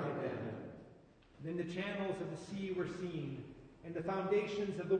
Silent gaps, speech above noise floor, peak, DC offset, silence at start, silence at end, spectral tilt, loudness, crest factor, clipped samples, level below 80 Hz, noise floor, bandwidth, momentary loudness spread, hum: none; 24 dB; -24 dBFS; under 0.1%; 0 s; 0 s; -7 dB/octave; -41 LUFS; 16 dB; under 0.1%; -70 dBFS; -62 dBFS; 9.4 kHz; 16 LU; none